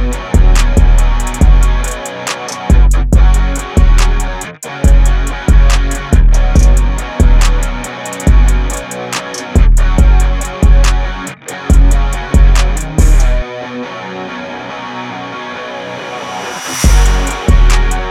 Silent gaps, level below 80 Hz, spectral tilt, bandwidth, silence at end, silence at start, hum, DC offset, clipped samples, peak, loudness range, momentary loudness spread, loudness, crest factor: none; -10 dBFS; -5 dB/octave; 12.5 kHz; 0 s; 0 s; none; under 0.1%; under 0.1%; 0 dBFS; 5 LU; 12 LU; -13 LUFS; 10 dB